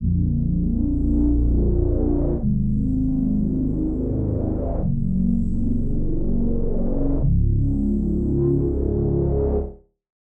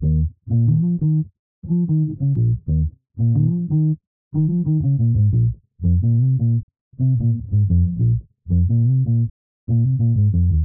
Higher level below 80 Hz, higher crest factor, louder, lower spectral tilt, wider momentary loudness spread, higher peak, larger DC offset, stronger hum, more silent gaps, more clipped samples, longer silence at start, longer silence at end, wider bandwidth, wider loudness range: first, -24 dBFS vs -32 dBFS; about the same, 10 dB vs 10 dB; second, -22 LUFS vs -19 LUFS; second, -14 dB/octave vs -20 dB/octave; second, 4 LU vs 7 LU; about the same, -8 dBFS vs -8 dBFS; neither; neither; second, none vs 1.39-1.62 s, 4.07-4.31 s, 6.63-6.68 s, 6.81-6.91 s, 9.30-9.67 s; neither; about the same, 0 s vs 0 s; first, 0.45 s vs 0 s; first, 1.6 kHz vs 1 kHz; about the same, 2 LU vs 1 LU